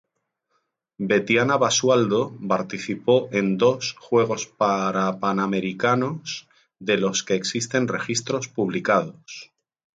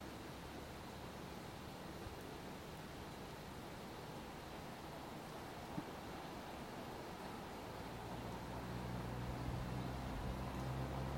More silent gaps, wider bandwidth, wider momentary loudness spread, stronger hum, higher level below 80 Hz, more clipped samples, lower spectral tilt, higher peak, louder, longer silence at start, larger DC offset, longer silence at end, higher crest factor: neither; second, 9.4 kHz vs 16.5 kHz; first, 11 LU vs 6 LU; neither; second, -66 dBFS vs -56 dBFS; neither; second, -4 dB/octave vs -5.5 dB/octave; first, -6 dBFS vs -32 dBFS; first, -22 LUFS vs -49 LUFS; first, 1 s vs 0 s; neither; first, 0.5 s vs 0 s; about the same, 18 dB vs 16 dB